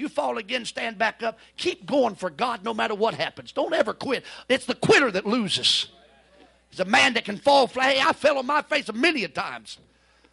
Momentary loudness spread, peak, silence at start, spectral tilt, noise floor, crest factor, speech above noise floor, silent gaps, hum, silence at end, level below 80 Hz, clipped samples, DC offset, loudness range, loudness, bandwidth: 11 LU; -6 dBFS; 0 s; -3 dB/octave; -56 dBFS; 18 dB; 32 dB; none; none; 0.55 s; -66 dBFS; under 0.1%; under 0.1%; 5 LU; -23 LUFS; 12 kHz